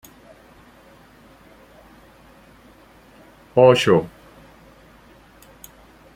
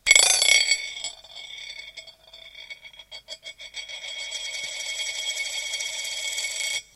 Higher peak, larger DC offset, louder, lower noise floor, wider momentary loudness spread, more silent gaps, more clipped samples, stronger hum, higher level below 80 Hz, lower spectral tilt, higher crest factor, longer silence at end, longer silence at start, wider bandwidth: about the same, -2 dBFS vs 0 dBFS; neither; first, -16 LUFS vs -23 LUFS; about the same, -49 dBFS vs -47 dBFS; first, 31 LU vs 24 LU; neither; neither; second, none vs 50 Hz at -70 dBFS; about the same, -56 dBFS vs -60 dBFS; first, -5.5 dB/octave vs 3.5 dB/octave; about the same, 24 dB vs 28 dB; first, 2.1 s vs 0.15 s; first, 3.55 s vs 0.05 s; about the same, 16 kHz vs 16.5 kHz